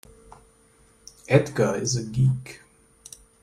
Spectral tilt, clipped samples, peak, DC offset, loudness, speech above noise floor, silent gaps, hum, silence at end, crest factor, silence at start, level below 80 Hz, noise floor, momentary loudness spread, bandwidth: -5.5 dB/octave; under 0.1%; -4 dBFS; under 0.1%; -23 LUFS; 35 dB; none; none; 0.85 s; 22 dB; 1.3 s; -54 dBFS; -58 dBFS; 23 LU; 13 kHz